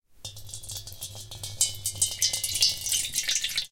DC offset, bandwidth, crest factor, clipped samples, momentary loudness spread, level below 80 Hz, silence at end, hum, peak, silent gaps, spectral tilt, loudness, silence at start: under 0.1%; 17 kHz; 24 dB; under 0.1%; 16 LU; -54 dBFS; 0.05 s; none; -6 dBFS; none; 1 dB/octave; -25 LUFS; 0.1 s